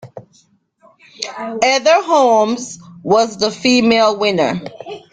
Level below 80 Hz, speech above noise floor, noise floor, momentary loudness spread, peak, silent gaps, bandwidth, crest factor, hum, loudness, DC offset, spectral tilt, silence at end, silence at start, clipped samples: -58 dBFS; 41 dB; -55 dBFS; 16 LU; 0 dBFS; none; 9.4 kHz; 16 dB; none; -14 LUFS; under 0.1%; -3.5 dB/octave; 0.15 s; 0.05 s; under 0.1%